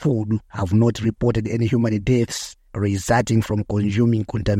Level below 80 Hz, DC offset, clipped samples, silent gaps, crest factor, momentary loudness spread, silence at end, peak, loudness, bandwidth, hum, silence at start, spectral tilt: -40 dBFS; under 0.1%; under 0.1%; none; 14 dB; 7 LU; 0 s; -6 dBFS; -21 LUFS; 14 kHz; none; 0 s; -6.5 dB/octave